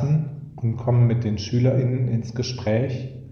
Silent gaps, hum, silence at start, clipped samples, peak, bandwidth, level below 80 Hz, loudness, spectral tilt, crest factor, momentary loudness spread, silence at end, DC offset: none; none; 0 s; under 0.1%; -8 dBFS; 6.8 kHz; -52 dBFS; -23 LUFS; -7.5 dB/octave; 14 dB; 9 LU; 0 s; under 0.1%